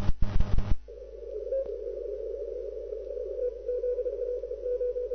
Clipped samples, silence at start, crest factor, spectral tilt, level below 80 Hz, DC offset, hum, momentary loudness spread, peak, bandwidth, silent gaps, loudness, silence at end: under 0.1%; 0 s; 18 dB; -8.5 dB/octave; -36 dBFS; under 0.1%; none; 7 LU; -10 dBFS; 6.2 kHz; none; -34 LUFS; 0 s